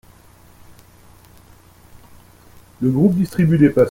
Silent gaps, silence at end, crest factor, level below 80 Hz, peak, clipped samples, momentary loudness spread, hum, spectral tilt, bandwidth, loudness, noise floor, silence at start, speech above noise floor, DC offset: none; 0 s; 18 dB; -48 dBFS; -2 dBFS; under 0.1%; 7 LU; 60 Hz at -45 dBFS; -9 dB/octave; 16.5 kHz; -16 LUFS; -47 dBFS; 2.8 s; 33 dB; under 0.1%